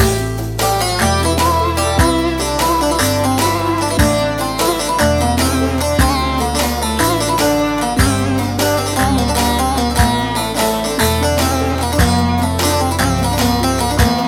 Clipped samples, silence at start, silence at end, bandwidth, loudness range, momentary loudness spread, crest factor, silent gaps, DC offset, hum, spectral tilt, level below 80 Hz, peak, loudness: under 0.1%; 0 s; 0 s; 17 kHz; 1 LU; 2 LU; 14 dB; none; under 0.1%; none; -4.5 dB/octave; -24 dBFS; 0 dBFS; -15 LUFS